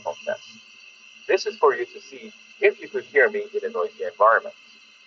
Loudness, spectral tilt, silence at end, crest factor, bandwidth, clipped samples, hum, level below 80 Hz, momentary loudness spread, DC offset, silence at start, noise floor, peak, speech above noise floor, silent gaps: -23 LUFS; 0 dB/octave; 0.55 s; 20 dB; 7.2 kHz; under 0.1%; none; -78 dBFS; 22 LU; under 0.1%; 0.05 s; -48 dBFS; -6 dBFS; 25 dB; none